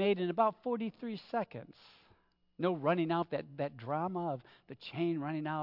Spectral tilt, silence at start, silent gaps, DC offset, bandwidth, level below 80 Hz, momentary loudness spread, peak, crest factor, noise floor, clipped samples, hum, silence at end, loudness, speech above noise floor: -5.5 dB/octave; 0 s; none; under 0.1%; 5.8 kHz; -80 dBFS; 13 LU; -16 dBFS; 20 dB; -70 dBFS; under 0.1%; none; 0 s; -36 LUFS; 35 dB